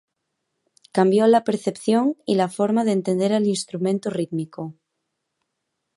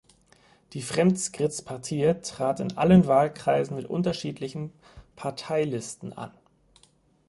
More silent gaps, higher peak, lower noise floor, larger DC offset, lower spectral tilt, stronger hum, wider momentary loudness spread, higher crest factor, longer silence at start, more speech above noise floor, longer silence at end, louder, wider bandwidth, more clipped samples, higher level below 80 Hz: neither; about the same, -4 dBFS vs -6 dBFS; first, -78 dBFS vs -62 dBFS; neither; about the same, -6 dB/octave vs -6 dB/octave; neither; second, 11 LU vs 18 LU; about the same, 18 dB vs 20 dB; first, 0.95 s vs 0.7 s; first, 58 dB vs 37 dB; first, 1.25 s vs 1 s; first, -21 LUFS vs -26 LUFS; about the same, 11.5 kHz vs 11.5 kHz; neither; second, -72 dBFS vs -56 dBFS